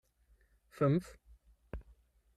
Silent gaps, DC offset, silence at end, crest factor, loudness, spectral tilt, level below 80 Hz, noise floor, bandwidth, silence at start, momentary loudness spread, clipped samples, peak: none; under 0.1%; 0.55 s; 20 dB; -33 LUFS; -8.5 dB/octave; -56 dBFS; -70 dBFS; 12.5 kHz; 0.8 s; 20 LU; under 0.1%; -20 dBFS